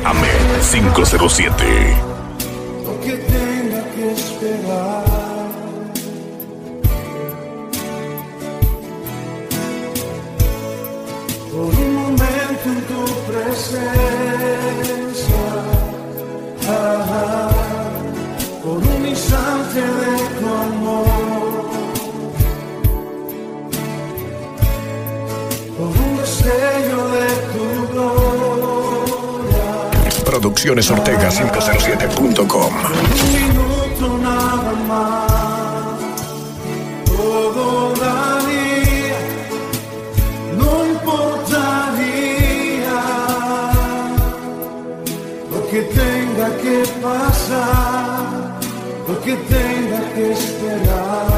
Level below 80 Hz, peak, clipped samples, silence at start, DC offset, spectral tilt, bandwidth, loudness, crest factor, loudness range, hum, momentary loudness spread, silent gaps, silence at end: -24 dBFS; 0 dBFS; under 0.1%; 0 s; under 0.1%; -5 dB/octave; 16 kHz; -18 LUFS; 16 dB; 8 LU; none; 11 LU; none; 0 s